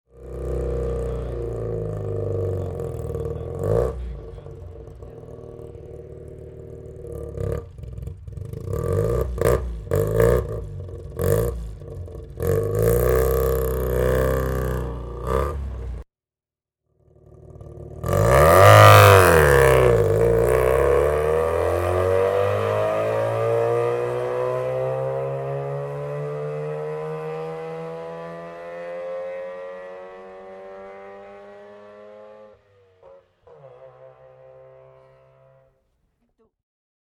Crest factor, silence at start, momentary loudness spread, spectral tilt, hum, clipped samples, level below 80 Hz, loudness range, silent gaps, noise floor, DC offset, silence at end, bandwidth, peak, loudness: 22 dB; 0.15 s; 24 LU; -6 dB/octave; none; under 0.1%; -34 dBFS; 21 LU; none; under -90 dBFS; under 0.1%; 3.1 s; 18 kHz; 0 dBFS; -20 LUFS